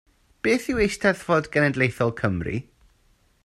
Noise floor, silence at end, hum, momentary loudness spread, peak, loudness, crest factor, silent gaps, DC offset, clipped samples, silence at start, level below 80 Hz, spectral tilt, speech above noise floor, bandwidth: -62 dBFS; 0.85 s; none; 8 LU; -4 dBFS; -23 LUFS; 20 dB; none; under 0.1%; under 0.1%; 0.45 s; -46 dBFS; -6 dB/octave; 39 dB; 14.5 kHz